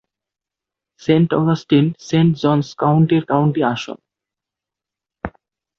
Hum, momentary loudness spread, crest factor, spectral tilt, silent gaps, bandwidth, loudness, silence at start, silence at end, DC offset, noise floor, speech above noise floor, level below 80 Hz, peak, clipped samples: none; 17 LU; 18 dB; -7.5 dB/octave; none; 7 kHz; -17 LUFS; 1.1 s; 0.5 s; under 0.1%; -86 dBFS; 71 dB; -52 dBFS; -2 dBFS; under 0.1%